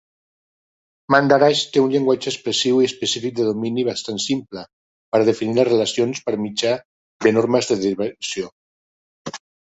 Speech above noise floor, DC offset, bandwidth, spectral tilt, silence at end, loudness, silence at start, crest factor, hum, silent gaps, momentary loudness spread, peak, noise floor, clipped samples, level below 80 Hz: over 71 dB; under 0.1%; 8.2 kHz; -4 dB/octave; 0.35 s; -19 LUFS; 1.1 s; 18 dB; none; 4.73-5.12 s, 6.85-7.20 s, 8.52-9.25 s; 14 LU; -2 dBFS; under -90 dBFS; under 0.1%; -62 dBFS